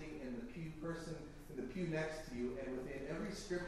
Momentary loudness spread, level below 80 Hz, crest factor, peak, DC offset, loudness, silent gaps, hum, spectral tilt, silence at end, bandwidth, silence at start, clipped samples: 7 LU; -58 dBFS; 18 dB; -28 dBFS; under 0.1%; -45 LUFS; none; none; -6 dB/octave; 0 s; 14 kHz; 0 s; under 0.1%